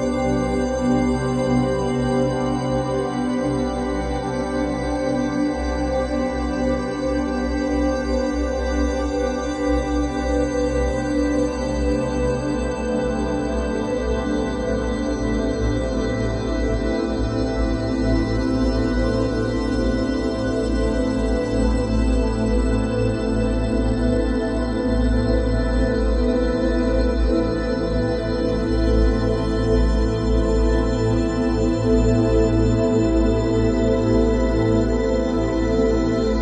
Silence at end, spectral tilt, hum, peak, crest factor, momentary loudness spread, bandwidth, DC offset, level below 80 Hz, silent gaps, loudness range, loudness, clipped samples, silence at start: 0 s; -7 dB/octave; none; -6 dBFS; 14 dB; 4 LU; 9 kHz; under 0.1%; -26 dBFS; none; 4 LU; -21 LUFS; under 0.1%; 0 s